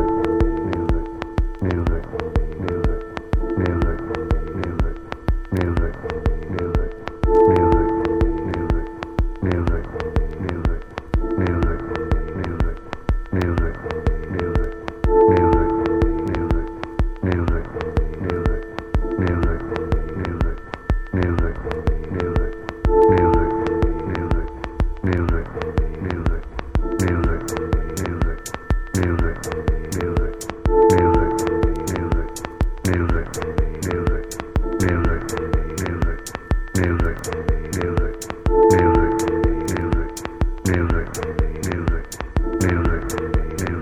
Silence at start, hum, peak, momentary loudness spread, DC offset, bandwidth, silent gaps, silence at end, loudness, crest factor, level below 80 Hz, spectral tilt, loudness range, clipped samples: 0 s; none; -2 dBFS; 10 LU; under 0.1%; 14.5 kHz; none; 0 s; -22 LUFS; 18 dB; -24 dBFS; -7 dB/octave; 4 LU; under 0.1%